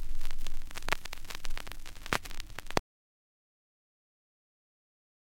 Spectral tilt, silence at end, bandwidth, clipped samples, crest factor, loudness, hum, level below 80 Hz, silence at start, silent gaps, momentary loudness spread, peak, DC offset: -3 dB/octave; 2.55 s; 16.5 kHz; under 0.1%; 24 dB; -39 LUFS; none; -38 dBFS; 0 s; none; 9 LU; -8 dBFS; under 0.1%